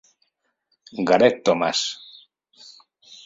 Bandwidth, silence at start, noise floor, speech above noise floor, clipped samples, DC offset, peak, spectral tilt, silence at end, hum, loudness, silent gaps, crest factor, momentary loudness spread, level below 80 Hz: 7.8 kHz; 0.95 s; -72 dBFS; 52 dB; under 0.1%; under 0.1%; -2 dBFS; -3.5 dB/octave; 0.1 s; none; -20 LUFS; none; 22 dB; 18 LU; -66 dBFS